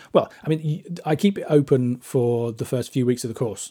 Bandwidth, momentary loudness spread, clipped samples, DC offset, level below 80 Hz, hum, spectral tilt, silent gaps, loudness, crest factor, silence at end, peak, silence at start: 17.5 kHz; 8 LU; under 0.1%; under 0.1%; -64 dBFS; none; -7 dB/octave; none; -23 LUFS; 18 dB; 0 s; -4 dBFS; 0 s